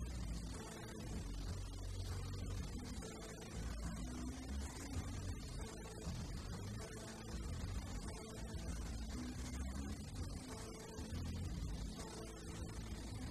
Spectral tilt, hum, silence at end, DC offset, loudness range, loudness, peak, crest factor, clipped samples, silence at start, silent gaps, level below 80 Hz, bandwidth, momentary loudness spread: -5 dB/octave; none; 0 s; under 0.1%; 1 LU; -48 LUFS; -34 dBFS; 12 dB; under 0.1%; 0 s; none; -50 dBFS; 14 kHz; 4 LU